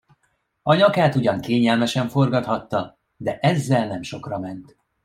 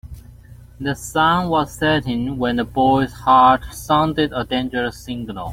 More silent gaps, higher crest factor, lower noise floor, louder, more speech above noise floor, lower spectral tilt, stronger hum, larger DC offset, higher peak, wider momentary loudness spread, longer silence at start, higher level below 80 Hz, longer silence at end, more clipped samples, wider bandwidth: neither; about the same, 18 dB vs 16 dB; first, -69 dBFS vs -42 dBFS; second, -21 LUFS vs -18 LUFS; first, 49 dB vs 24 dB; about the same, -6.5 dB/octave vs -5.5 dB/octave; neither; neither; about the same, -4 dBFS vs -2 dBFS; about the same, 14 LU vs 12 LU; first, 0.65 s vs 0.05 s; second, -58 dBFS vs -40 dBFS; first, 0.4 s vs 0 s; neither; about the same, 15.5 kHz vs 16.5 kHz